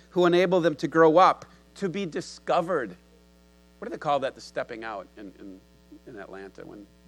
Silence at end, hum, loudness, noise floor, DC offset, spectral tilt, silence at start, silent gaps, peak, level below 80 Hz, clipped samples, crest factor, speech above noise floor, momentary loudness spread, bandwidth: 0.25 s; none; -25 LUFS; -57 dBFS; under 0.1%; -6 dB/octave; 0.15 s; none; -6 dBFS; -62 dBFS; under 0.1%; 20 dB; 31 dB; 25 LU; 12 kHz